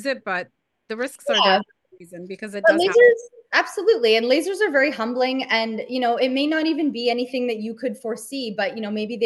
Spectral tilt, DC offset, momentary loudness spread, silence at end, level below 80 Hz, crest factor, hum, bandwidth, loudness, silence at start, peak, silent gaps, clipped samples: -3.5 dB/octave; under 0.1%; 13 LU; 0 s; -74 dBFS; 18 dB; none; 12.5 kHz; -21 LUFS; 0 s; -4 dBFS; none; under 0.1%